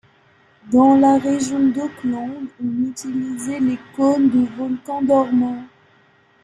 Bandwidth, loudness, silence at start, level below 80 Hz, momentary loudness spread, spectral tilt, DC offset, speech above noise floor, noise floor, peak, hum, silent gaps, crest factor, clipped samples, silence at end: 10.5 kHz; -19 LUFS; 0.65 s; -60 dBFS; 12 LU; -6 dB/octave; under 0.1%; 37 dB; -55 dBFS; -2 dBFS; none; none; 16 dB; under 0.1%; 0.75 s